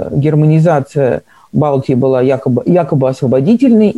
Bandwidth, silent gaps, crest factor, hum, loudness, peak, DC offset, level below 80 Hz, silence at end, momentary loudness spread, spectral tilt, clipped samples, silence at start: 10 kHz; none; 10 dB; none; -12 LUFS; 0 dBFS; 0.2%; -46 dBFS; 0 s; 6 LU; -9.5 dB/octave; under 0.1%; 0 s